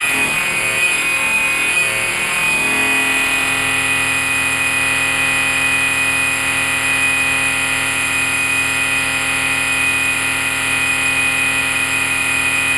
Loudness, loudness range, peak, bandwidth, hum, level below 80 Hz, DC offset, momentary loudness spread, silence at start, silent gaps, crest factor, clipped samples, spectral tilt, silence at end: -14 LUFS; 1 LU; -4 dBFS; 16 kHz; none; -42 dBFS; under 0.1%; 2 LU; 0 s; none; 12 dB; under 0.1%; -1 dB/octave; 0 s